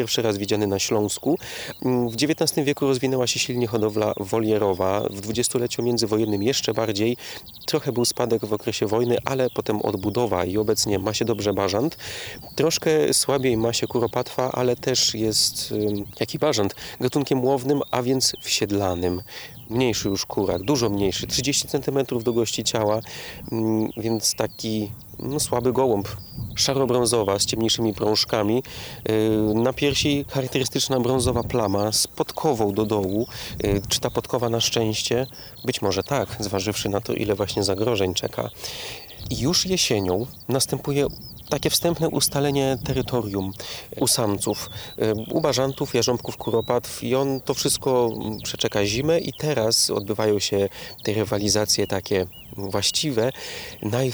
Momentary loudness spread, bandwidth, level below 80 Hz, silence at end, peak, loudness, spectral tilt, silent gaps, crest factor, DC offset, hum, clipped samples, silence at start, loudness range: 8 LU; over 20 kHz; -48 dBFS; 0 s; -4 dBFS; -23 LUFS; -4 dB/octave; none; 20 dB; under 0.1%; none; under 0.1%; 0 s; 2 LU